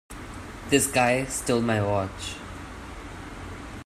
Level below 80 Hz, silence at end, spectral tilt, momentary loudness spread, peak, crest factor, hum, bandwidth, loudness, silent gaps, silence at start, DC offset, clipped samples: -46 dBFS; 0 s; -4 dB/octave; 18 LU; -4 dBFS; 22 dB; none; 15.5 kHz; -24 LUFS; none; 0.1 s; under 0.1%; under 0.1%